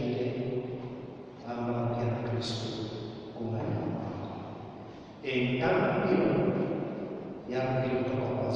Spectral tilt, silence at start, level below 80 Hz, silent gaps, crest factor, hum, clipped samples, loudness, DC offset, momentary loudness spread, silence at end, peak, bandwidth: -7.5 dB/octave; 0 s; -60 dBFS; none; 18 dB; none; under 0.1%; -32 LUFS; under 0.1%; 15 LU; 0 s; -14 dBFS; 9.2 kHz